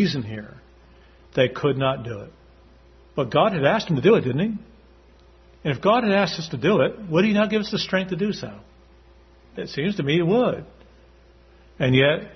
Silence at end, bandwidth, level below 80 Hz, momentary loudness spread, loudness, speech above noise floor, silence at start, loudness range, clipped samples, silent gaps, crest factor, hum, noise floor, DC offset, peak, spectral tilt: 0 s; 6.4 kHz; -52 dBFS; 16 LU; -22 LUFS; 30 dB; 0 s; 5 LU; under 0.1%; none; 20 dB; none; -52 dBFS; under 0.1%; -4 dBFS; -6.5 dB/octave